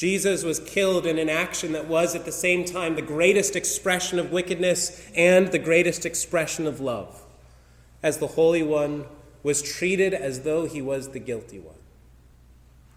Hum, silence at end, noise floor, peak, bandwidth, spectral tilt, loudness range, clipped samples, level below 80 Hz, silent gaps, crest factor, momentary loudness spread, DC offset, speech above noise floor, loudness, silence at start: none; 1.2 s; -52 dBFS; -6 dBFS; 16.5 kHz; -3.5 dB/octave; 5 LU; under 0.1%; -54 dBFS; none; 20 dB; 11 LU; under 0.1%; 29 dB; -24 LUFS; 0 s